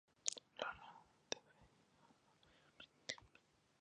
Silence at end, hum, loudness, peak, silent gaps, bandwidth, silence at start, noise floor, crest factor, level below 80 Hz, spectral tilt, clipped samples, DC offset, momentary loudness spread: 0.55 s; none; -49 LUFS; -16 dBFS; none; 9.6 kHz; 0.25 s; -74 dBFS; 38 dB; -82 dBFS; 0 dB/octave; under 0.1%; under 0.1%; 18 LU